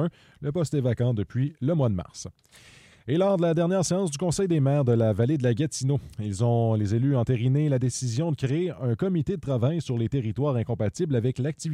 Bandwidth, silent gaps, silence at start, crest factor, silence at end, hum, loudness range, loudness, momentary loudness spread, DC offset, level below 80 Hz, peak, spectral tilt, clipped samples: 11.5 kHz; none; 0 s; 14 dB; 0 s; none; 3 LU; -26 LUFS; 6 LU; under 0.1%; -54 dBFS; -12 dBFS; -7 dB/octave; under 0.1%